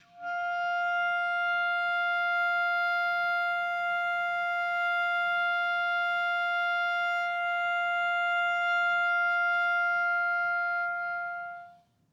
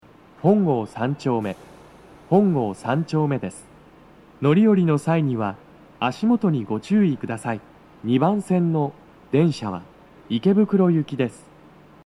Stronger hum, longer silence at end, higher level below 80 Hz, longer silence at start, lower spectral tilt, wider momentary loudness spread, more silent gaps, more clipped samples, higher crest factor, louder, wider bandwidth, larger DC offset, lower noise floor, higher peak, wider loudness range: neither; second, 0.4 s vs 0.7 s; second, -86 dBFS vs -60 dBFS; second, 0.15 s vs 0.45 s; second, -1 dB/octave vs -8 dB/octave; second, 5 LU vs 11 LU; neither; neither; second, 8 dB vs 16 dB; second, -28 LUFS vs -22 LUFS; first, 15 kHz vs 11 kHz; neither; first, -55 dBFS vs -49 dBFS; second, -20 dBFS vs -4 dBFS; about the same, 1 LU vs 3 LU